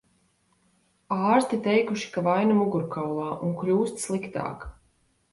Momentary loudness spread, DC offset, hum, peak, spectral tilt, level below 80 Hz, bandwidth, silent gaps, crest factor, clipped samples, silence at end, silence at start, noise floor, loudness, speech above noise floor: 11 LU; under 0.1%; none; -8 dBFS; -6 dB/octave; -56 dBFS; 11.5 kHz; none; 20 dB; under 0.1%; 0.6 s; 1.1 s; -67 dBFS; -26 LUFS; 42 dB